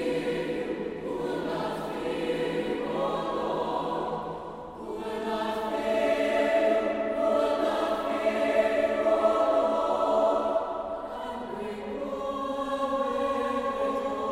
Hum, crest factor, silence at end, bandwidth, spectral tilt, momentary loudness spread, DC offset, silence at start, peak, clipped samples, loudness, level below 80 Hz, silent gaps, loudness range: none; 16 dB; 0 s; 15 kHz; -5.5 dB/octave; 11 LU; under 0.1%; 0 s; -12 dBFS; under 0.1%; -28 LUFS; -56 dBFS; none; 6 LU